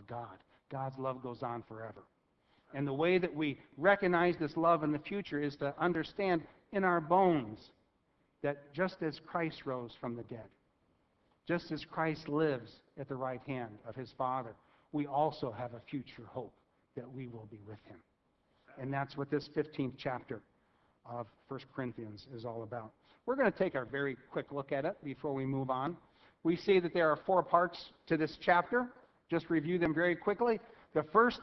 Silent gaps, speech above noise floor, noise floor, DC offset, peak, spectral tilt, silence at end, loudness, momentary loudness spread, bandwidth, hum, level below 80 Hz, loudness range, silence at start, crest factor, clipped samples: none; 41 dB; -76 dBFS; under 0.1%; -12 dBFS; -5 dB/octave; 0 s; -35 LUFS; 18 LU; 6.2 kHz; none; -70 dBFS; 10 LU; 0 s; 24 dB; under 0.1%